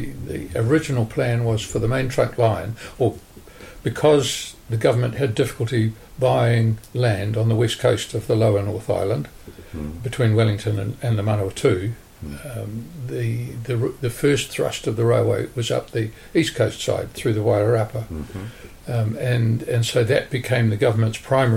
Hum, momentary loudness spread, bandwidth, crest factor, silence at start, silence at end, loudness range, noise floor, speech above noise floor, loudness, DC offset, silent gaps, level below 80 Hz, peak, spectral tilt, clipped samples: none; 12 LU; 16 kHz; 16 dB; 0 s; 0 s; 3 LU; -42 dBFS; 21 dB; -21 LUFS; under 0.1%; none; -44 dBFS; -6 dBFS; -6 dB/octave; under 0.1%